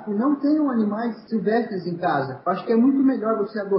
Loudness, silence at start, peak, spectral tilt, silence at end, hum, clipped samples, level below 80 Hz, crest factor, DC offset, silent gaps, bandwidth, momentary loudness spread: -22 LUFS; 0 s; -10 dBFS; -12 dB/octave; 0 s; none; under 0.1%; -70 dBFS; 12 dB; under 0.1%; none; 5.6 kHz; 7 LU